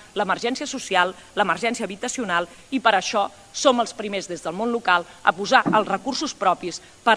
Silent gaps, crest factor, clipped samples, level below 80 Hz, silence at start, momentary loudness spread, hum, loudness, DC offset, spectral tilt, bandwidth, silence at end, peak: none; 22 dB; under 0.1%; -60 dBFS; 0 s; 9 LU; none; -22 LUFS; under 0.1%; -3 dB/octave; 11 kHz; 0 s; 0 dBFS